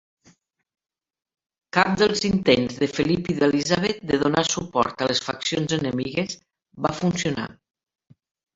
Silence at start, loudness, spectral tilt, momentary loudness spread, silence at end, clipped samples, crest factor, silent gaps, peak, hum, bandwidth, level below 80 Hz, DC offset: 1.75 s; -23 LUFS; -4.5 dB/octave; 8 LU; 1 s; under 0.1%; 22 dB; none; -2 dBFS; none; 8.2 kHz; -54 dBFS; under 0.1%